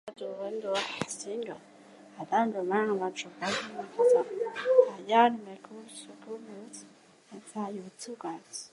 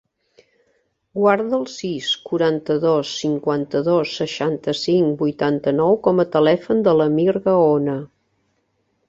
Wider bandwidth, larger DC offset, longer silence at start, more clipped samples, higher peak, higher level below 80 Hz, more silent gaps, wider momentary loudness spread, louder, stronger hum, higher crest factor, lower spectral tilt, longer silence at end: first, 11.5 kHz vs 7.8 kHz; neither; second, 0.05 s vs 1.15 s; neither; second, -8 dBFS vs -2 dBFS; second, -80 dBFS vs -60 dBFS; neither; first, 22 LU vs 7 LU; second, -30 LUFS vs -19 LUFS; neither; about the same, 22 dB vs 18 dB; second, -4 dB/octave vs -6 dB/octave; second, 0.05 s vs 1 s